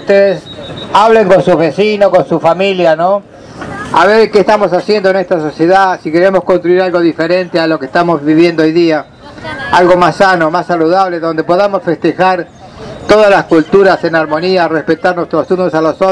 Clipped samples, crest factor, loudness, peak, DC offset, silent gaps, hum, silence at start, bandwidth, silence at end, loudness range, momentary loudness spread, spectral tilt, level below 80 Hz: 3%; 10 dB; -9 LUFS; 0 dBFS; under 0.1%; none; none; 0 s; 11 kHz; 0 s; 1 LU; 9 LU; -6 dB/octave; -44 dBFS